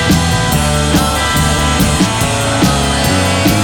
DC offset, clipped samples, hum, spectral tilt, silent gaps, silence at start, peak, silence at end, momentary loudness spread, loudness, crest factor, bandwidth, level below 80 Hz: under 0.1%; under 0.1%; none; -4 dB/octave; none; 0 s; 0 dBFS; 0 s; 1 LU; -12 LUFS; 12 dB; over 20 kHz; -22 dBFS